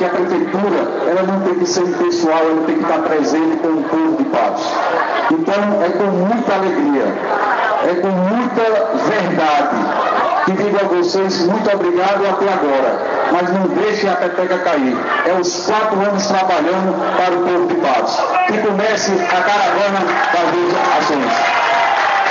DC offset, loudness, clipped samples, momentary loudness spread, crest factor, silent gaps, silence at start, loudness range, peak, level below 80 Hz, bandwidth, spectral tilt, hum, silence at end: under 0.1%; -15 LUFS; under 0.1%; 2 LU; 14 dB; none; 0 s; 1 LU; -2 dBFS; -66 dBFS; 7.6 kHz; -5 dB/octave; none; 0 s